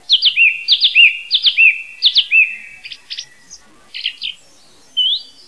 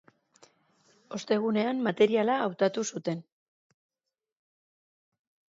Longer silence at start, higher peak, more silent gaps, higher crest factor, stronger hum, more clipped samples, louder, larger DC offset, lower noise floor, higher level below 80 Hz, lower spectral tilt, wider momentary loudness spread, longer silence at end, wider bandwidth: second, 0.1 s vs 1.1 s; first, 0 dBFS vs -12 dBFS; neither; about the same, 16 dB vs 20 dB; neither; neither; first, -11 LUFS vs -28 LUFS; first, 0.4% vs under 0.1%; second, -48 dBFS vs -66 dBFS; first, -66 dBFS vs -80 dBFS; second, 3.5 dB/octave vs -5 dB/octave; first, 20 LU vs 13 LU; second, 0.25 s vs 2.25 s; first, 11 kHz vs 8 kHz